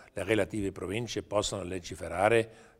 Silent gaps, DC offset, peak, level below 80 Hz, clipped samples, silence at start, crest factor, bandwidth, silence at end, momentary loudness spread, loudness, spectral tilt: none; under 0.1%; -8 dBFS; -54 dBFS; under 0.1%; 0 s; 22 dB; 16 kHz; 0.15 s; 11 LU; -31 LUFS; -4.5 dB/octave